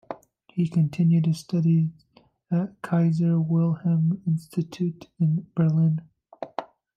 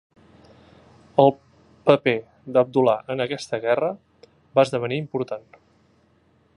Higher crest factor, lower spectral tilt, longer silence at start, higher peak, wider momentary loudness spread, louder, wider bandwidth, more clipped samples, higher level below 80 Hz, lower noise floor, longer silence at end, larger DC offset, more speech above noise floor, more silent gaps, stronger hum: second, 14 dB vs 24 dB; first, -9 dB/octave vs -6.5 dB/octave; second, 0.1 s vs 1.15 s; second, -10 dBFS vs 0 dBFS; first, 14 LU vs 10 LU; about the same, -24 LUFS vs -22 LUFS; second, 9 kHz vs 11 kHz; neither; about the same, -68 dBFS vs -66 dBFS; second, -41 dBFS vs -61 dBFS; second, 0.3 s vs 1.15 s; neither; second, 19 dB vs 40 dB; neither; neither